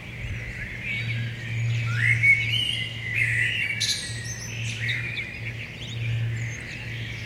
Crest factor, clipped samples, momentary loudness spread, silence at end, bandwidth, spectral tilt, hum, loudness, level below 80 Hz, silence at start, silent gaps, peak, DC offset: 18 dB; under 0.1%; 14 LU; 0 s; 13.5 kHz; -3 dB/octave; none; -25 LUFS; -46 dBFS; 0 s; none; -10 dBFS; under 0.1%